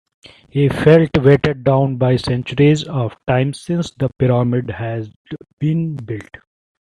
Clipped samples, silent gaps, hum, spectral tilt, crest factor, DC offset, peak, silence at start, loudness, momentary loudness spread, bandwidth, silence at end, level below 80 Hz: under 0.1%; 5.16-5.25 s, 5.53-5.57 s; none; -7.5 dB/octave; 16 dB; under 0.1%; 0 dBFS; 0.55 s; -16 LUFS; 16 LU; 11 kHz; 0.75 s; -44 dBFS